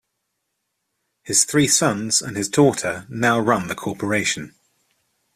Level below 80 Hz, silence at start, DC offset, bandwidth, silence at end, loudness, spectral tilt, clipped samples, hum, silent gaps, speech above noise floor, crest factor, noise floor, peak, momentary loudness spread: -58 dBFS; 1.25 s; under 0.1%; 15.5 kHz; 0.85 s; -19 LUFS; -3 dB/octave; under 0.1%; none; none; 56 dB; 20 dB; -76 dBFS; -2 dBFS; 11 LU